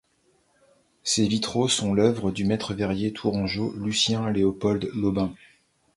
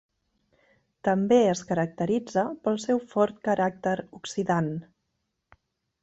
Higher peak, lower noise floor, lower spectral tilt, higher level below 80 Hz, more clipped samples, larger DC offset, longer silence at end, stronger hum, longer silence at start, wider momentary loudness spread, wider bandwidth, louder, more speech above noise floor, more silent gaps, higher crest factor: about the same, -6 dBFS vs -8 dBFS; second, -66 dBFS vs -79 dBFS; second, -4.5 dB/octave vs -6 dB/octave; first, -52 dBFS vs -66 dBFS; neither; neither; second, 0.6 s vs 1.2 s; neither; about the same, 1.05 s vs 1.05 s; second, 5 LU vs 10 LU; first, 11.5 kHz vs 8.2 kHz; about the same, -25 LUFS vs -26 LUFS; second, 42 dB vs 53 dB; neither; about the same, 20 dB vs 18 dB